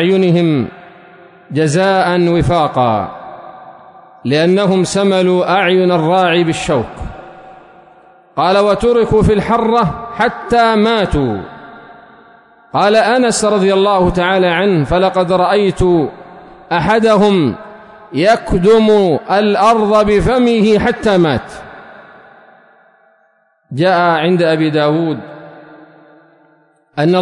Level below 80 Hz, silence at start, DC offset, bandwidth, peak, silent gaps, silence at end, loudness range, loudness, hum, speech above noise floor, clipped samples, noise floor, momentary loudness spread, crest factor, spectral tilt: -34 dBFS; 0 s; under 0.1%; 11 kHz; -2 dBFS; none; 0 s; 4 LU; -12 LUFS; none; 44 dB; under 0.1%; -56 dBFS; 13 LU; 12 dB; -6 dB/octave